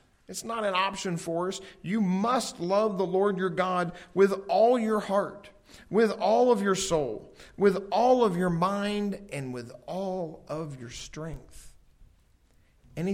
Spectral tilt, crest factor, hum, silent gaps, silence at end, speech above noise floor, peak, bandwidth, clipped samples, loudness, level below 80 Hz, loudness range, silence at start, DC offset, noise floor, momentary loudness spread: -5.5 dB/octave; 18 dB; none; none; 0 s; 35 dB; -10 dBFS; 16 kHz; under 0.1%; -27 LUFS; -56 dBFS; 12 LU; 0.3 s; under 0.1%; -62 dBFS; 15 LU